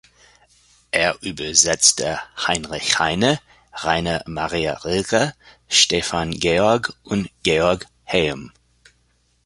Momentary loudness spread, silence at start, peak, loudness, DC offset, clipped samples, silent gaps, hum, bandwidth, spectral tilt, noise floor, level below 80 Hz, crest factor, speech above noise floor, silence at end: 11 LU; 0.95 s; 0 dBFS; -19 LUFS; under 0.1%; under 0.1%; none; 60 Hz at -50 dBFS; 11.5 kHz; -2.5 dB/octave; -63 dBFS; -46 dBFS; 22 dB; 43 dB; 0.95 s